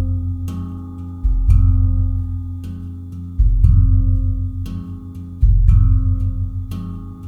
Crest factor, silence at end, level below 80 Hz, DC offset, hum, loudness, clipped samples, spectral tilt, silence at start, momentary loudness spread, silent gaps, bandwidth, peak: 16 dB; 0 s; -18 dBFS; under 0.1%; none; -19 LUFS; under 0.1%; -10 dB/octave; 0 s; 16 LU; none; 1.5 kHz; 0 dBFS